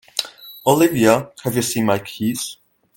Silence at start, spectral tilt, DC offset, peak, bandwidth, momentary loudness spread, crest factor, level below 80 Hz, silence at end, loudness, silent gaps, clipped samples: 0.15 s; -4.5 dB/octave; under 0.1%; 0 dBFS; 17 kHz; 12 LU; 20 dB; -58 dBFS; 0.45 s; -19 LUFS; none; under 0.1%